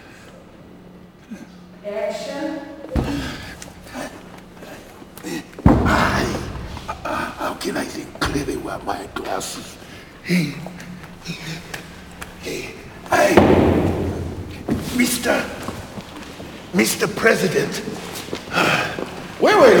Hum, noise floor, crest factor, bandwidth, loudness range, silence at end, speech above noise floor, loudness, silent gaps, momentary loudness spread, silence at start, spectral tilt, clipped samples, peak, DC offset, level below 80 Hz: none; -43 dBFS; 22 dB; over 20 kHz; 10 LU; 0 s; 24 dB; -21 LUFS; none; 21 LU; 0 s; -5 dB/octave; under 0.1%; 0 dBFS; under 0.1%; -36 dBFS